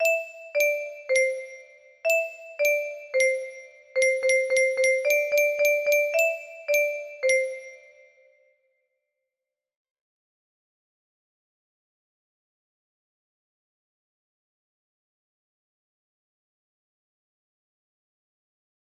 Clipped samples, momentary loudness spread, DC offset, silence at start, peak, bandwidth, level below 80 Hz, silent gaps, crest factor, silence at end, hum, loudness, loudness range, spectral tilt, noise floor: under 0.1%; 11 LU; under 0.1%; 0 s; -10 dBFS; 14.5 kHz; -80 dBFS; none; 18 dB; 11.1 s; none; -24 LUFS; 7 LU; 1.5 dB/octave; -88 dBFS